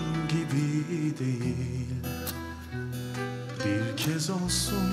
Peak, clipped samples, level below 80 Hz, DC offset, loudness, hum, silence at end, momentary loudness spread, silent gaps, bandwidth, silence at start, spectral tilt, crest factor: -14 dBFS; under 0.1%; -48 dBFS; under 0.1%; -30 LUFS; none; 0 s; 8 LU; none; 16 kHz; 0 s; -5 dB/octave; 14 dB